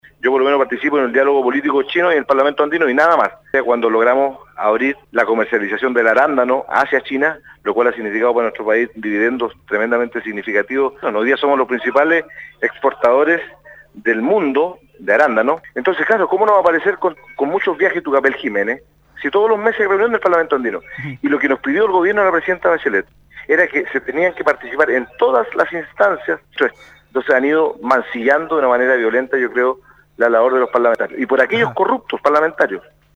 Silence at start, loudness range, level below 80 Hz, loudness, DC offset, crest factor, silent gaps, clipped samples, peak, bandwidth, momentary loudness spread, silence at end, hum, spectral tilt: 0.25 s; 2 LU; -56 dBFS; -16 LUFS; under 0.1%; 16 dB; none; under 0.1%; 0 dBFS; 7.8 kHz; 7 LU; 0.35 s; none; -6 dB/octave